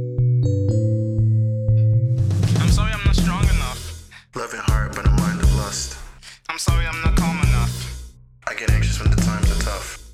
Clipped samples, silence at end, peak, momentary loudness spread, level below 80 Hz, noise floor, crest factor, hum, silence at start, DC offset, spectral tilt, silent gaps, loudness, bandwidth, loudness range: under 0.1%; 0 s; -4 dBFS; 13 LU; -24 dBFS; -40 dBFS; 14 dB; none; 0 s; under 0.1%; -5.5 dB/octave; none; -20 LUFS; 15 kHz; 4 LU